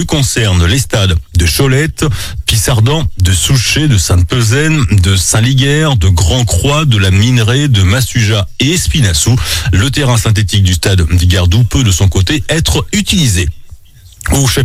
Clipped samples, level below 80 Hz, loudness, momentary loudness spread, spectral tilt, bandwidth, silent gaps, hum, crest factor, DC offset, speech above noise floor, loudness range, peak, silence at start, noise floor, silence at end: under 0.1%; -22 dBFS; -10 LUFS; 3 LU; -4.5 dB/octave; 16.5 kHz; none; none; 10 dB; under 0.1%; 25 dB; 2 LU; 0 dBFS; 0 s; -35 dBFS; 0 s